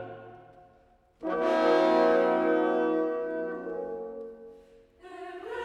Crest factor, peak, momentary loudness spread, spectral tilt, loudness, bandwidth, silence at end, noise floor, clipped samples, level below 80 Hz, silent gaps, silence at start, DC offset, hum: 16 dB; -12 dBFS; 21 LU; -6 dB/octave; -27 LUFS; 9.4 kHz; 0 s; -62 dBFS; under 0.1%; -66 dBFS; none; 0 s; under 0.1%; none